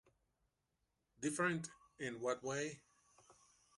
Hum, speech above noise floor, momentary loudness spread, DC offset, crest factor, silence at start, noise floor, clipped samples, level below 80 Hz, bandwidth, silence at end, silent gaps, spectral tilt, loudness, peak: none; 45 dB; 11 LU; under 0.1%; 22 dB; 1.2 s; -86 dBFS; under 0.1%; -80 dBFS; 11.5 kHz; 0.45 s; none; -4.5 dB/octave; -42 LUFS; -24 dBFS